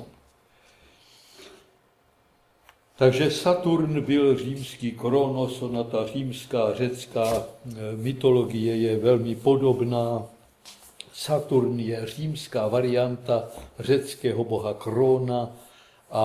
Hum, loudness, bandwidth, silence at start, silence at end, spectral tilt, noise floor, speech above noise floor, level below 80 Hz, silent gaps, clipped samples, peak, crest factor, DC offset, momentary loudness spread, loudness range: none; -25 LUFS; 15.5 kHz; 0 s; 0 s; -6.5 dB/octave; -63 dBFS; 39 dB; -60 dBFS; none; under 0.1%; -6 dBFS; 20 dB; under 0.1%; 11 LU; 3 LU